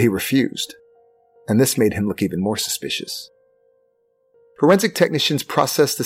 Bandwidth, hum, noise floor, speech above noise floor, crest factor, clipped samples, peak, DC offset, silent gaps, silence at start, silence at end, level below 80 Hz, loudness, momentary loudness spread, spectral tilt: 16.5 kHz; none; -64 dBFS; 45 dB; 18 dB; under 0.1%; -4 dBFS; under 0.1%; none; 0 s; 0 s; -56 dBFS; -19 LUFS; 12 LU; -4.5 dB/octave